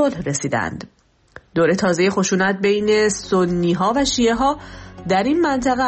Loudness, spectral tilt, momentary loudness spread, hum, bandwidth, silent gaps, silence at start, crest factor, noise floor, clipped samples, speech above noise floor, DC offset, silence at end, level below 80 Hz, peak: -18 LUFS; -4.5 dB/octave; 10 LU; none; 8.8 kHz; none; 0 s; 12 dB; -46 dBFS; under 0.1%; 28 dB; under 0.1%; 0 s; -44 dBFS; -6 dBFS